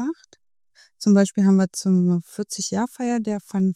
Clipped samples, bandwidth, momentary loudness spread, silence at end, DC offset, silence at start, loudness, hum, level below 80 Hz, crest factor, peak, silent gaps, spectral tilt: under 0.1%; 13 kHz; 10 LU; 0 s; under 0.1%; 0 s; -21 LUFS; none; -68 dBFS; 16 dB; -4 dBFS; none; -6 dB/octave